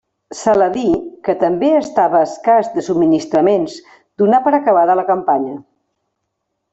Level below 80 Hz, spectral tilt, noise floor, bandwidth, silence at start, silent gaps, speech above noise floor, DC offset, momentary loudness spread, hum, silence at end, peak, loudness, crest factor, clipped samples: -52 dBFS; -6 dB/octave; -73 dBFS; 8.2 kHz; 0.3 s; none; 59 dB; under 0.1%; 8 LU; none; 1.1 s; -2 dBFS; -15 LUFS; 12 dB; under 0.1%